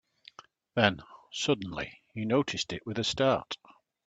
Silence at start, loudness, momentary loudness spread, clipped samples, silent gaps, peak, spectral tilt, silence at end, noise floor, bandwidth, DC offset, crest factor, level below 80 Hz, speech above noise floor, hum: 0.75 s; -30 LUFS; 14 LU; under 0.1%; none; -4 dBFS; -4.5 dB/octave; 0.5 s; -55 dBFS; 9.2 kHz; under 0.1%; 26 dB; -62 dBFS; 25 dB; none